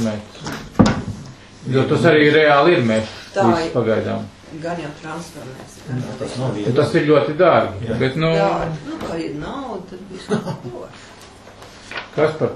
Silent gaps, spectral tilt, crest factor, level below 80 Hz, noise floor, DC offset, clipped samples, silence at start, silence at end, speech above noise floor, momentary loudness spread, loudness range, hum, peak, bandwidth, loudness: none; -6.5 dB/octave; 18 dB; -46 dBFS; -41 dBFS; under 0.1%; under 0.1%; 0 s; 0 s; 22 dB; 21 LU; 10 LU; none; 0 dBFS; 12.5 kHz; -18 LUFS